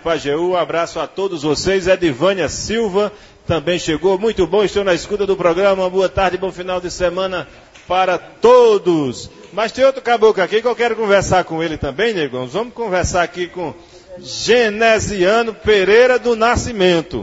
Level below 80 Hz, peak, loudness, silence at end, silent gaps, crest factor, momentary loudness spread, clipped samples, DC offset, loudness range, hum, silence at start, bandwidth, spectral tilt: -38 dBFS; 0 dBFS; -16 LUFS; 0 s; none; 16 dB; 10 LU; under 0.1%; under 0.1%; 4 LU; none; 0.05 s; 8 kHz; -4.5 dB/octave